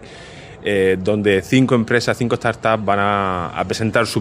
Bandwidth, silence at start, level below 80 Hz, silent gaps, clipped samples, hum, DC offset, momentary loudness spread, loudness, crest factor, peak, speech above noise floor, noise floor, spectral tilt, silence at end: 16 kHz; 0 s; -50 dBFS; none; under 0.1%; none; under 0.1%; 8 LU; -18 LUFS; 16 dB; -2 dBFS; 20 dB; -37 dBFS; -5.5 dB/octave; 0 s